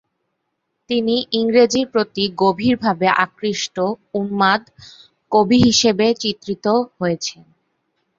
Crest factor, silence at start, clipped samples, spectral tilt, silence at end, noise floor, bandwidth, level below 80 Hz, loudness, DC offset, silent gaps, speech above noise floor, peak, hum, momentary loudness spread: 18 dB; 0.9 s; under 0.1%; -4 dB/octave; 0.85 s; -74 dBFS; 7.8 kHz; -52 dBFS; -18 LUFS; under 0.1%; none; 56 dB; -2 dBFS; none; 9 LU